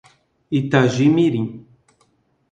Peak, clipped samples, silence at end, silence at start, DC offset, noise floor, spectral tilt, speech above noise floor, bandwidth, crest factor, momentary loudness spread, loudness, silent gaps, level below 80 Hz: 0 dBFS; under 0.1%; 0.9 s; 0.5 s; under 0.1%; -62 dBFS; -7 dB/octave; 46 dB; 9 kHz; 20 dB; 10 LU; -18 LUFS; none; -58 dBFS